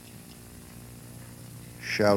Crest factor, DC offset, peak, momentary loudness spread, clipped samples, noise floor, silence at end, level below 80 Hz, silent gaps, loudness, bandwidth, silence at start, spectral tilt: 22 dB; under 0.1%; -8 dBFS; 15 LU; under 0.1%; -47 dBFS; 0 s; -58 dBFS; none; -37 LUFS; 17 kHz; 0.05 s; -5 dB/octave